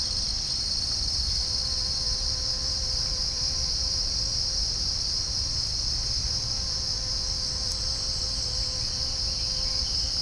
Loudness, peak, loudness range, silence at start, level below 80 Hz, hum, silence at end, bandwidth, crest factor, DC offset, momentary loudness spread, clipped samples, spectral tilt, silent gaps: -25 LUFS; -12 dBFS; 1 LU; 0 s; -36 dBFS; none; 0 s; 10.5 kHz; 16 dB; under 0.1%; 2 LU; under 0.1%; -1.5 dB/octave; none